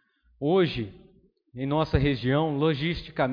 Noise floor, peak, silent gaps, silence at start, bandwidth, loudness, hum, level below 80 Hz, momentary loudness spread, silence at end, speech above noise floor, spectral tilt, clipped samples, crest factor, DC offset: -60 dBFS; -10 dBFS; none; 0.4 s; 5.2 kHz; -26 LUFS; none; -42 dBFS; 11 LU; 0 s; 35 dB; -8.5 dB/octave; under 0.1%; 18 dB; under 0.1%